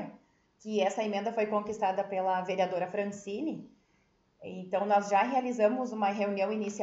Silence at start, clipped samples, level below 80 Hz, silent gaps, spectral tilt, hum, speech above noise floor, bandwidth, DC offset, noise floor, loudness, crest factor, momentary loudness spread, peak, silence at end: 0 s; under 0.1%; -76 dBFS; none; -5.5 dB/octave; none; 40 dB; 8 kHz; under 0.1%; -70 dBFS; -31 LUFS; 18 dB; 12 LU; -14 dBFS; 0 s